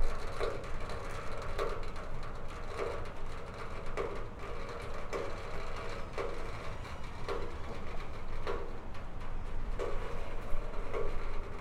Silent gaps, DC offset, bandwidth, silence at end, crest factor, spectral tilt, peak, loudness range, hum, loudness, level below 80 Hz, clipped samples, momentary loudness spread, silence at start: none; under 0.1%; 9.8 kHz; 0 s; 16 dB; -5.5 dB/octave; -18 dBFS; 2 LU; none; -42 LUFS; -38 dBFS; under 0.1%; 6 LU; 0 s